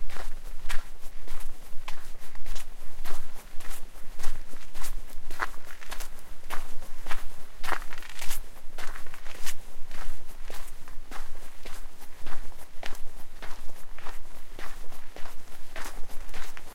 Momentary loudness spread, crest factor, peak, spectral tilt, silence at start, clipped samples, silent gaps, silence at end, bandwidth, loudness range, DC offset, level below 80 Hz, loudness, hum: 10 LU; 12 dB; -8 dBFS; -3 dB/octave; 0 s; under 0.1%; none; 0.05 s; 14 kHz; 6 LU; under 0.1%; -34 dBFS; -42 LUFS; none